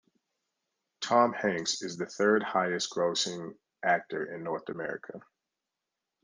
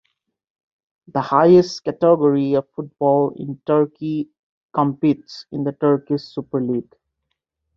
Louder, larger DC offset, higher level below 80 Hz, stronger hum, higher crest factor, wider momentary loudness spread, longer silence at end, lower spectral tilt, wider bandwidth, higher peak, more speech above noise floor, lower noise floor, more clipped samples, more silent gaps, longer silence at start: second, -30 LUFS vs -19 LUFS; neither; second, -78 dBFS vs -60 dBFS; neither; about the same, 22 dB vs 18 dB; first, 15 LU vs 12 LU; about the same, 1.05 s vs 0.95 s; second, -3 dB/octave vs -8 dB/octave; first, 10.5 kHz vs 7.2 kHz; second, -10 dBFS vs -2 dBFS; about the same, 58 dB vs 58 dB; first, -88 dBFS vs -77 dBFS; neither; second, none vs 4.39-4.69 s; second, 1 s vs 1.15 s